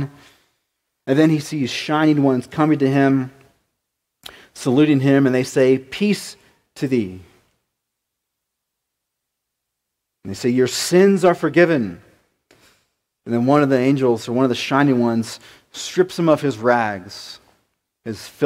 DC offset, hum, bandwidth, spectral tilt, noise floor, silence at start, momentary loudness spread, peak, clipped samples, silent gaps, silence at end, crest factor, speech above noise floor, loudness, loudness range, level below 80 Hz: under 0.1%; none; 16 kHz; -6 dB/octave; -79 dBFS; 0 s; 17 LU; 0 dBFS; under 0.1%; none; 0 s; 18 dB; 62 dB; -18 LUFS; 8 LU; -62 dBFS